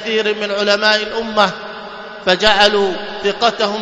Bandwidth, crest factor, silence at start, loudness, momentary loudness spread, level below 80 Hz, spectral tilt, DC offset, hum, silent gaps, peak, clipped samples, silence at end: 11 kHz; 16 dB; 0 s; -15 LUFS; 14 LU; -46 dBFS; -3 dB/octave; under 0.1%; none; none; 0 dBFS; under 0.1%; 0 s